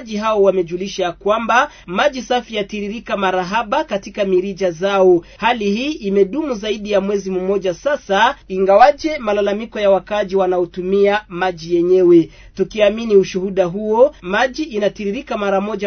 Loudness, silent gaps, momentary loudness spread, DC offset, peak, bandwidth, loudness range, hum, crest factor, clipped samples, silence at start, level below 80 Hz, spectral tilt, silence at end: -17 LUFS; none; 8 LU; under 0.1%; 0 dBFS; 6.6 kHz; 3 LU; none; 16 dB; under 0.1%; 0 s; -46 dBFS; -5.5 dB/octave; 0 s